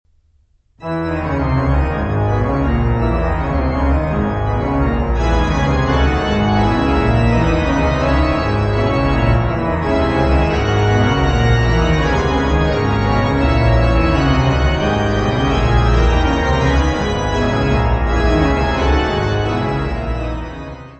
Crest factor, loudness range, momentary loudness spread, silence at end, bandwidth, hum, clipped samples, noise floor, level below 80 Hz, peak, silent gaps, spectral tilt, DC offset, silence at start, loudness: 14 dB; 2 LU; 4 LU; 0.05 s; 8.4 kHz; none; under 0.1%; -56 dBFS; -20 dBFS; -2 dBFS; none; -7 dB/octave; under 0.1%; 0.8 s; -16 LUFS